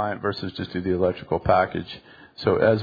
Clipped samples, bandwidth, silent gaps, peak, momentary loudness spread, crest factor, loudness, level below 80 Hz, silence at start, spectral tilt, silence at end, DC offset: under 0.1%; 5 kHz; none; -4 dBFS; 12 LU; 20 dB; -24 LUFS; -48 dBFS; 0 s; -8.5 dB/octave; 0 s; under 0.1%